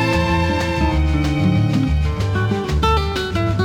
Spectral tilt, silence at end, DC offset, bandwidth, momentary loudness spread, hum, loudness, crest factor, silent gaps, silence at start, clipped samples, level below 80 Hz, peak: -6.5 dB/octave; 0 s; under 0.1%; 14 kHz; 3 LU; none; -18 LUFS; 14 dB; none; 0 s; under 0.1%; -26 dBFS; -4 dBFS